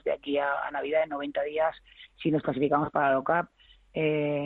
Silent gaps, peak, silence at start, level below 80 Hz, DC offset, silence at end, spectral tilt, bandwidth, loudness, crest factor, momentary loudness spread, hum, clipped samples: none; -12 dBFS; 0.05 s; -62 dBFS; under 0.1%; 0 s; -9 dB/octave; 4.4 kHz; -28 LUFS; 18 dB; 6 LU; none; under 0.1%